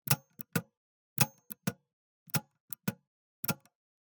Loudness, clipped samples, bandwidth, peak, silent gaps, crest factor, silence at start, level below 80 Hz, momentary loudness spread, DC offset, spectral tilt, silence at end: -35 LUFS; under 0.1%; 19.5 kHz; -8 dBFS; 0.77-1.16 s, 1.93-2.26 s, 2.60-2.68 s, 3.07-3.43 s; 30 dB; 0.05 s; -72 dBFS; 11 LU; under 0.1%; -3.5 dB/octave; 0.45 s